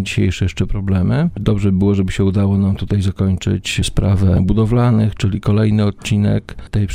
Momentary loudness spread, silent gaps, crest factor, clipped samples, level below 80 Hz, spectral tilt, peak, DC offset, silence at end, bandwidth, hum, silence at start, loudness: 5 LU; none; 14 dB; under 0.1%; -28 dBFS; -7 dB/octave; 0 dBFS; under 0.1%; 0 s; 11 kHz; none; 0 s; -16 LUFS